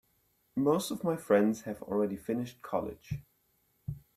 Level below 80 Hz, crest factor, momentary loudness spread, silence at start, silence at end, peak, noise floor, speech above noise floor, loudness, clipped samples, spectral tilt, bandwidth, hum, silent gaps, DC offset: -62 dBFS; 20 dB; 16 LU; 0.55 s; 0.2 s; -14 dBFS; -73 dBFS; 42 dB; -32 LUFS; under 0.1%; -6 dB/octave; 15.5 kHz; none; none; under 0.1%